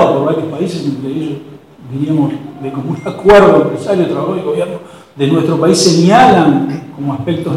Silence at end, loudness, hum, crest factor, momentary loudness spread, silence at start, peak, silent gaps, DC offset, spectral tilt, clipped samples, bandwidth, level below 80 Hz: 0 s; -12 LUFS; none; 12 dB; 15 LU; 0 s; 0 dBFS; none; under 0.1%; -5.5 dB/octave; 0.7%; 14.5 kHz; -40 dBFS